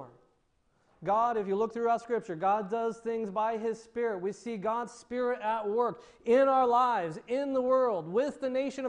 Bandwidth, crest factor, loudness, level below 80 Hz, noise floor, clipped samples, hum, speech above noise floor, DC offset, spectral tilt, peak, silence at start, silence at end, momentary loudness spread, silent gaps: 10 kHz; 16 dB; -30 LUFS; -72 dBFS; -72 dBFS; under 0.1%; none; 42 dB; under 0.1%; -6 dB/octave; -14 dBFS; 0 s; 0 s; 10 LU; none